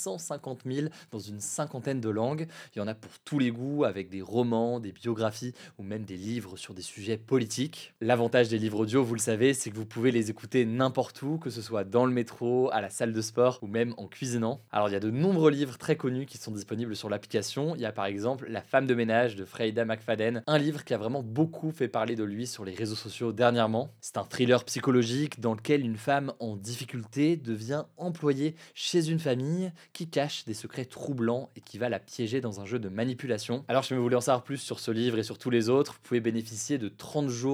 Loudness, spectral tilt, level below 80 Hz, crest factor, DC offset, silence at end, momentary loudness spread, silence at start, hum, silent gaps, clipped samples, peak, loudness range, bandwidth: -30 LUFS; -5.5 dB/octave; -82 dBFS; 22 dB; under 0.1%; 0 s; 11 LU; 0 s; none; none; under 0.1%; -8 dBFS; 5 LU; 18.5 kHz